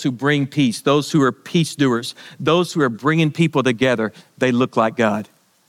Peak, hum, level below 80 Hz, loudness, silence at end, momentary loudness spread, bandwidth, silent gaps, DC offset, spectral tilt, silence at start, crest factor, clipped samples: -4 dBFS; none; -66 dBFS; -18 LUFS; 0.45 s; 5 LU; 15.5 kHz; none; under 0.1%; -5.5 dB/octave; 0 s; 16 dB; under 0.1%